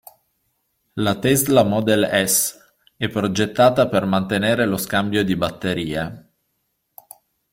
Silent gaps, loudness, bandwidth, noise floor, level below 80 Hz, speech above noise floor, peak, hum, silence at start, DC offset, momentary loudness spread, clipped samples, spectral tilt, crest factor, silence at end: none; -19 LUFS; 16.5 kHz; -72 dBFS; -52 dBFS; 53 dB; -2 dBFS; none; 0.95 s; under 0.1%; 9 LU; under 0.1%; -4 dB/octave; 18 dB; 1.35 s